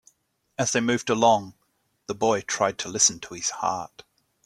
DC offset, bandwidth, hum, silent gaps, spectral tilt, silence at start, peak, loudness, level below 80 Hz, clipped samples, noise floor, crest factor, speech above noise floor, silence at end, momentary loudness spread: under 0.1%; 14.5 kHz; none; none; -2.5 dB/octave; 0.6 s; -4 dBFS; -24 LUFS; -64 dBFS; under 0.1%; -71 dBFS; 22 dB; 47 dB; 0.45 s; 18 LU